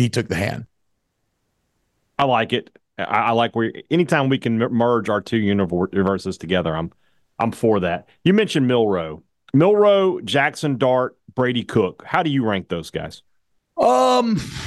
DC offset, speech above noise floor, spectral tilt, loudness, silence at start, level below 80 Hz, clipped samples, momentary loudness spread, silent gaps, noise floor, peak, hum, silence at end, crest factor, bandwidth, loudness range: under 0.1%; 53 dB; -6 dB/octave; -20 LUFS; 0 s; -52 dBFS; under 0.1%; 11 LU; none; -72 dBFS; -4 dBFS; none; 0 s; 16 dB; 12.5 kHz; 4 LU